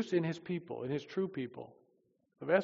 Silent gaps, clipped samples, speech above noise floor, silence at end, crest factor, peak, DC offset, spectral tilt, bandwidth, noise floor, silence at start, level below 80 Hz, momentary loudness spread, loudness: none; under 0.1%; 37 dB; 0 s; 22 dB; -16 dBFS; under 0.1%; -6 dB/octave; 7.2 kHz; -75 dBFS; 0 s; -80 dBFS; 13 LU; -38 LUFS